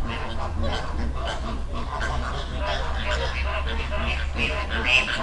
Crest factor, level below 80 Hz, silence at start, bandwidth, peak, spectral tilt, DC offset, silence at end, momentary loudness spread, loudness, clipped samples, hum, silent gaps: 20 dB; -28 dBFS; 0 s; 11 kHz; -6 dBFS; -4.5 dB/octave; under 0.1%; 0 s; 9 LU; -26 LUFS; under 0.1%; none; none